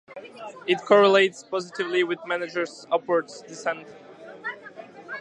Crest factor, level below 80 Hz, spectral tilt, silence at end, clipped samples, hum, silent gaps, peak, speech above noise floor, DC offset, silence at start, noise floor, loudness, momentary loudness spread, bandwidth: 22 dB; -80 dBFS; -4 dB/octave; 0 s; under 0.1%; none; none; -4 dBFS; 20 dB; under 0.1%; 0.1 s; -43 dBFS; -24 LUFS; 23 LU; 9.6 kHz